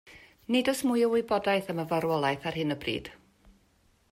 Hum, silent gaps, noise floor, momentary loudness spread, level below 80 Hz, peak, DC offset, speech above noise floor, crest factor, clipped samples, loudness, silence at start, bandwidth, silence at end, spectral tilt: none; none; -66 dBFS; 8 LU; -62 dBFS; -14 dBFS; under 0.1%; 38 dB; 16 dB; under 0.1%; -28 LUFS; 0.05 s; 16 kHz; 0.95 s; -5 dB/octave